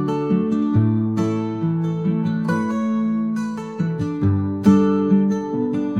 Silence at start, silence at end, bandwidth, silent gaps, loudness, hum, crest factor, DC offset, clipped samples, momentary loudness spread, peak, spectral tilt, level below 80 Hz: 0 s; 0 s; 9.2 kHz; none; -20 LUFS; none; 16 dB; 0.1%; under 0.1%; 7 LU; -2 dBFS; -9 dB/octave; -56 dBFS